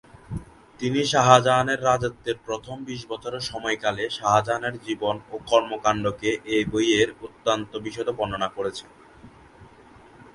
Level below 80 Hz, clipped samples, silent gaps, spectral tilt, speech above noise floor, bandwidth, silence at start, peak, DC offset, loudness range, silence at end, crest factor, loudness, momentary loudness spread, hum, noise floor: -52 dBFS; under 0.1%; none; -4.5 dB/octave; 26 dB; 11.5 kHz; 0.3 s; 0 dBFS; under 0.1%; 4 LU; 0.1 s; 24 dB; -24 LUFS; 13 LU; none; -50 dBFS